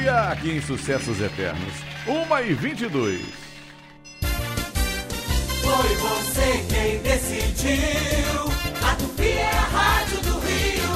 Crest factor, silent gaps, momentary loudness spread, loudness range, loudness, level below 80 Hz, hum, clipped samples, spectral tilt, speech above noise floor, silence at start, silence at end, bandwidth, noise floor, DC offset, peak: 16 dB; none; 8 LU; 5 LU; -23 LUFS; -30 dBFS; none; under 0.1%; -4 dB/octave; 22 dB; 0 s; 0 s; 16 kHz; -44 dBFS; under 0.1%; -6 dBFS